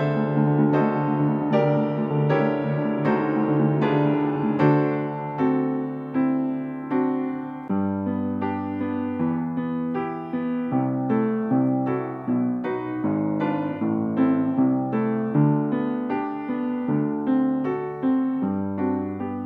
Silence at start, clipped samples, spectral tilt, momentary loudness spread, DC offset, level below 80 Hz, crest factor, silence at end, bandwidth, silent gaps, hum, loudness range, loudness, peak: 0 s; under 0.1%; -10.5 dB/octave; 7 LU; under 0.1%; -68 dBFS; 16 dB; 0 s; 5.2 kHz; none; none; 4 LU; -24 LUFS; -6 dBFS